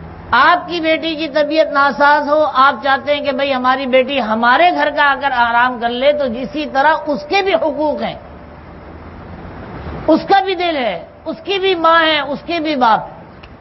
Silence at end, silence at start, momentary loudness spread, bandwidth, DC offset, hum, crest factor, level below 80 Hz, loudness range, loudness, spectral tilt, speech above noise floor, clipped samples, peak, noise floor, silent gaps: 0.05 s; 0 s; 16 LU; 6 kHz; under 0.1%; none; 14 dB; -44 dBFS; 6 LU; -14 LUFS; -5.5 dB/octave; 21 dB; under 0.1%; 0 dBFS; -35 dBFS; none